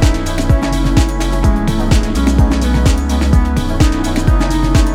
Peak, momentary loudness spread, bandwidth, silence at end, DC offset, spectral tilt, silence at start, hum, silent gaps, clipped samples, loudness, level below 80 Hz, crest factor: 0 dBFS; 2 LU; 14.5 kHz; 0 s; under 0.1%; -6 dB/octave; 0 s; none; none; under 0.1%; -14 LUFS; -14 dBFS; 12 dB